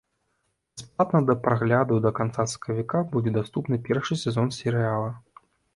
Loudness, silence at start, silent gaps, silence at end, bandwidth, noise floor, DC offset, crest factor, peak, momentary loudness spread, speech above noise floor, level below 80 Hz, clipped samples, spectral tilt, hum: -25 LUFS; 0.75 s; none; 0.55 s; 11.5 kHz; -74 dBFS; under 0.1%; 20 dB; -6 dBFS; 9 LU; 50 dB; -58 dBFS; under 0.1%; -6.5 dB/octave; none